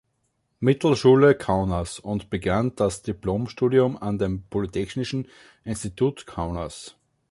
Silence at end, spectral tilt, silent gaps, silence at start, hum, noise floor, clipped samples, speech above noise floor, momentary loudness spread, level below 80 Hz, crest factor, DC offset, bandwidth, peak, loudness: 0.4 s; -6.5 dB/octave; none; 0.6 s; none; -72 dBFS; under 0.1%; 49 dB; 15 LU; -44 dBFS; 18 dB; under 0.1%; 11.5 kHz; -6 dBFS; -24 LUFS